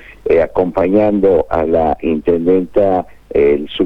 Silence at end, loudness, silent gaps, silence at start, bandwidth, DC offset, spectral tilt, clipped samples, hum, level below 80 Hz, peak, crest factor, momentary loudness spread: 0 s; -14 LUFS; none; 0 s; 5.2 kHz; under 0.1%; -8.5 dB/octave; under 0.1%; none; -36 dBFS; -2 dBFS; 12 dB; 3 LU